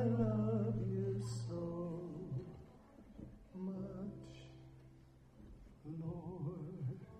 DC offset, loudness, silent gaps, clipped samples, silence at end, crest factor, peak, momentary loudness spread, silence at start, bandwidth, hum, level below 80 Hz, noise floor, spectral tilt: under 0.1%; -42 LUFS; none; under 0.1%; 0 s; 18 dB; -24 dBFS; 23 LU; 0 s; 9.8 kHz; none; -62 dBFS; -63 dBFS; -9 dB/octave